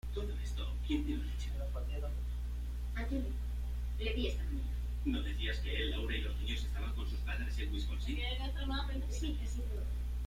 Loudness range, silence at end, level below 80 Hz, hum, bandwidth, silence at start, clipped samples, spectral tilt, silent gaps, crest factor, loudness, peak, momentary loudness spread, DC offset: 2 LU; 0 s; -38 dBFS; 60 Hz at -35 dBFS; 14.5 kHz; 0.05 s; under 0.1%; -6 dB/octave; none; 14 dB; -39 LUFS; -22 dBFS; 4 LU; under 0.1%